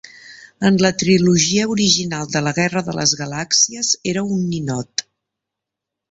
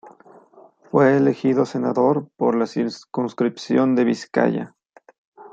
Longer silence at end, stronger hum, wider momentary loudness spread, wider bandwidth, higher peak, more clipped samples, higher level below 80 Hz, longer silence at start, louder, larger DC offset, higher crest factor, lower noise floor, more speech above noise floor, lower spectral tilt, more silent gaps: first, 1.1 s vs 0.05 s; neither; about the same, 8 LU vs 9 LU; about the same, 8.2 kHz vs 7.8 kHz; about the same, -2 dBFS vs -2 dBFS; neither; first, -52 dBFS vs -68 dBFS; about the same, 0.05 s vs 0.05 s; first, -17 LUFS vs -20 LUFS; neither; about the same, 18 dB vs 18 dB; first, -83 dBFS vs -50 dBFS; first, 66 dB vs 31 dB; second, -3.5 dB/octave vs -7 dB/octave; second, none vs 5.18-5.32 s